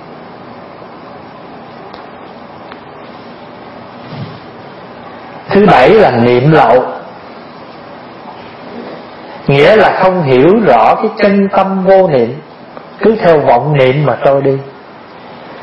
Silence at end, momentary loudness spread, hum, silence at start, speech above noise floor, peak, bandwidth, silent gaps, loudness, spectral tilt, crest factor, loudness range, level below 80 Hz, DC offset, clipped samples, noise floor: 0 s; 24 LU; none; 0 s; 25 dB; 0 dBFS; 8 kHz; none; -8 LUFS; -8.5 dB/octave; 12 dB; 21 LU; -44 dBFS; under 0.1%; 0.5%; -32 dBFS